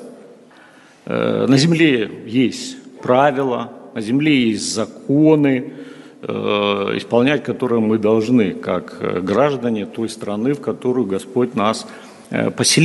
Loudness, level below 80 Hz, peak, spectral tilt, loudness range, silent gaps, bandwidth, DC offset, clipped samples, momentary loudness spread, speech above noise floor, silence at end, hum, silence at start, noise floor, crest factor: -18 LUFS; -60 dBFS; 0 dBFS; -5 dB/octave; 3 LU; none; 11.5 kHz; under 0.1%; under 0.1%; 13 LU; 29 dB; 0 s; none; 0 s; -46 dBFS; 18 dB